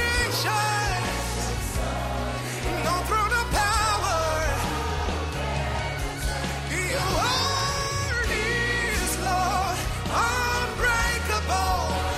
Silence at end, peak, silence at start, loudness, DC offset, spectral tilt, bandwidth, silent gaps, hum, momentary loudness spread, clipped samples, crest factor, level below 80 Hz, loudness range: 0 s; -12 dBFS; 0 s; -25 LUFS; under 0.1%; -3.5 dB/octave; 16 kHz; none; none; 6 LU; under 0.1%; 14 dB; -34 dBFS; 2 LU